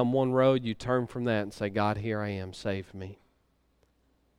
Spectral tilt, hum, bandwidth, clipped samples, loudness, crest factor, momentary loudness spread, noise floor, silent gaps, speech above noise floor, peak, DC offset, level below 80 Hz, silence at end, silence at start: -7 dB/octave; none; 11.5 kHz; under 0.1%; -29 LUFS; 20 dB; 12 LU; -70 dBFS; none; 41 dB; -12 dBFS; under 0.1%; -60 dBFS; 1.25 s; 0 s